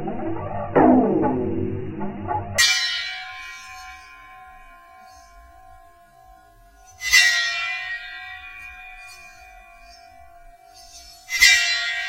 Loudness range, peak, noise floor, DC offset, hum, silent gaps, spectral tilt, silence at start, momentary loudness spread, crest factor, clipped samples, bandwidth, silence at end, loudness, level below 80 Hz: 18 LU; 0 dBFS; -50 dBFS; under 0.1%; none; none; -2.5 dB/octave; 0 s; 25 LU; 24 dB; under 0.1%; 16 kHz; 0 s; -19 LUFS; -48 dBFS